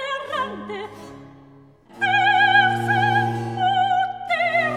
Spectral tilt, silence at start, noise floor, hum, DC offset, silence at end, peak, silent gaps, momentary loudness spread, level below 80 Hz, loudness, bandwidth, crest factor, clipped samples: -5 dB/octave; 0 s; -49 dBFS; none; under 0.1%; 0 s; -4 dBFS; none; 17 LU; -62 dBFS; -19 LUFS; 13.5 kHz; 16 dB; under 0.1%